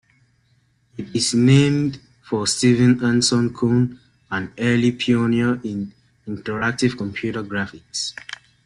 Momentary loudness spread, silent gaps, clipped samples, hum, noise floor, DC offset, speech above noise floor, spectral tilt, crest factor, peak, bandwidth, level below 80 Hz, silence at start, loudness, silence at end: 17 LU; none; under 0.1%; none; -61 dBFS; under 0.1%; 42 dB; -5 dB/octave; 18 dB; -2 dBFS; 11.5 kHz; -54 dBFS; 1 s; -20 LUFS; 0.3 s